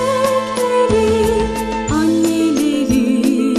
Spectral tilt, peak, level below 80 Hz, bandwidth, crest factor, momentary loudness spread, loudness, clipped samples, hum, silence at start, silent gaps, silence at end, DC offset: -5 dB/octave; -2 dBFS; -34 dBFS; 14.5 kHz; 12 dB; 4 LU; -15 LUFS; under 0.1%; none; 0 s; none; 0 s; under 0.1%